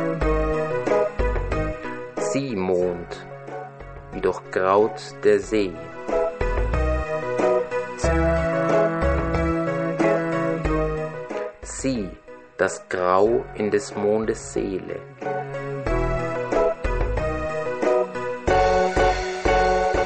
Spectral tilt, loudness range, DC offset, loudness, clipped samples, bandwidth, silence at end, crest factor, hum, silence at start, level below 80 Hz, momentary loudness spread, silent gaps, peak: -6 dB/octave; 4 LU; under 0.1%; -23 LUFS; under 0.1%; 8.8 kHz; 0 s; 18 dB; none; 0 s; -32 dBFS; 12 LU; none; -4 dBFS